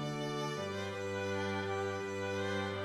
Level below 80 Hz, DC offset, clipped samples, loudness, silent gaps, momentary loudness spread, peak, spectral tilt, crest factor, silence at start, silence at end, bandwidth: -74 dBFS; under 0.1%; under 0.1%; -38 LUFS; none; 3 LU; -26 dBFS; -5 dB/octave; 12 dB; 0 s; 0 s; 15 kHz